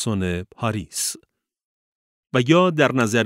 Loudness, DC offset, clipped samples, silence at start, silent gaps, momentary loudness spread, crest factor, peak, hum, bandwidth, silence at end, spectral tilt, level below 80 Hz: -21 LUFS; under 0.1%; under 0.1%; 0 s; 1.65-2.23 s; 10 LU; 18 dB; -2 dBFS; none; 16 kHz; 0 s; -5 dB/octave; -54 dBFS